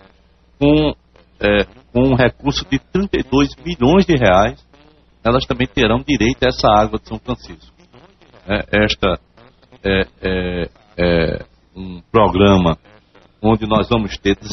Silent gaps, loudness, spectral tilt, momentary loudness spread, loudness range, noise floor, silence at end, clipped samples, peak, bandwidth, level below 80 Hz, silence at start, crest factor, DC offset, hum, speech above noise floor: none; -16 LUFS; -4.5 dB/octave; 14 LU; 5 LU; -52 dBFS; 0 s; under 0.1%; 0 dBFS; 6.2 kHz; -32 dBFS; 0.6 s; 16 dB; under 0.1%; none; 36 dB